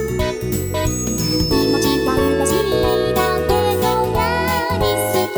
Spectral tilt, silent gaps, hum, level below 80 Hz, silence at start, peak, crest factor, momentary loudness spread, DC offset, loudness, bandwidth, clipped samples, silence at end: -4.5 dB/octave; none; none; -32 dBFS; 0 s; -2 dBFS; 14 dB; 4 LU; under 0.1%; -18 LUFS; over 20 kHz; under 0.1%; 0 s